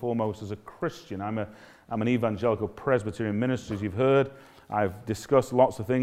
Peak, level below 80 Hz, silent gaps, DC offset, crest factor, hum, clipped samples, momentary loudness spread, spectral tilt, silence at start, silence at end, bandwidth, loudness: -8 dBFS; -60 dBFS; none; under 0.1%; 20 dB; none; under 0.1%; 11 LU; -7 dB/octave; 0 s; 0 s; 15.5 kHz; -28 LUFS